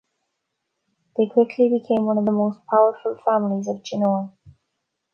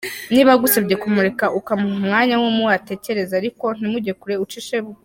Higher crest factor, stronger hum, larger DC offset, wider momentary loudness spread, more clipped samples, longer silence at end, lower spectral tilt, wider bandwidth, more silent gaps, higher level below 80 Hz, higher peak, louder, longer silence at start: about the same, 18 dB vs 16 dB; neither; neither; second, 8 LU vs 11 LU; neither; first, 0.65 s vs 0.1 s; first, -7.5 dB/octave vs -4.5 dB/octave; second, 6.8 kHz vs 17 kHz; neither; second, -68 dBFS vs -58 dBFS; about the same, -4 dBFS vs -2 dBFS; second, -21 LUFS vs -18 LUFS; first, 1.2 s vs 0 s